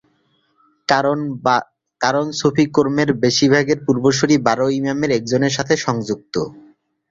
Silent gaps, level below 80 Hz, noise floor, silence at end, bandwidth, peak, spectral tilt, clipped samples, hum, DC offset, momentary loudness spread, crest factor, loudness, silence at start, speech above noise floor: none; -54 dBFS; -63 dBFS; 0.5 s; 7.8 kHz; -2 dBFS; -5 dB/octave; under 0.1%; none; under 0.1%; 8 LU; 16 dB; -17 LUFS; 0.9 s; 46 dB